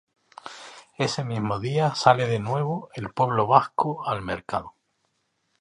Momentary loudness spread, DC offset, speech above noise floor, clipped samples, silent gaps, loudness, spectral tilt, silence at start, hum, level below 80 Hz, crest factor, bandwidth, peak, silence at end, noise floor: 21 LU; under 0.1%; 49 dB; under 0.1%; none; -24 LUFS; -6 dB/octave; 0.45 s; none; -58 dBFS; 24 dB; 11 kHz; -2 dBFS; 0.9 s; -73 dBFS